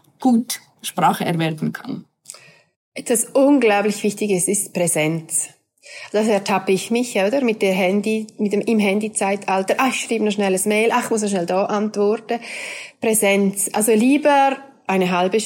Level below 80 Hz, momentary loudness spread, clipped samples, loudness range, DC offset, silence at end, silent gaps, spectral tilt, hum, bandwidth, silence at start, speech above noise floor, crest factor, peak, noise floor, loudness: -76 dBFS; 13 LU; under 0.1%; 2 LU; under 0.1%; 0 s; 2.76-2.92 s; -4 dB/octave; none; 17 kHz; 0.2 s; 24 dB; 14 dB; -6 dBFS; -43 dBFS; -19 LUFS